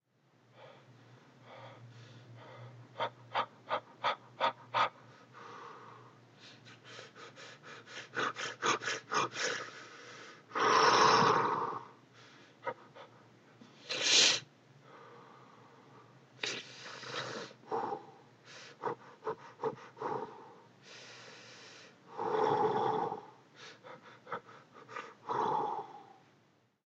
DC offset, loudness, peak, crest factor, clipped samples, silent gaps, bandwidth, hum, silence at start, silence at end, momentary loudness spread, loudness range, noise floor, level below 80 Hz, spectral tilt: under 0.1%; -33 LUFS; -12 dBFS; 24 dB; under 0.1%; none; 9.2 kHz; none; 0.6 s; 0.85 s; 27 LU; 13 LU; -70 dBFS; -86 dBFS; -2 dB/octave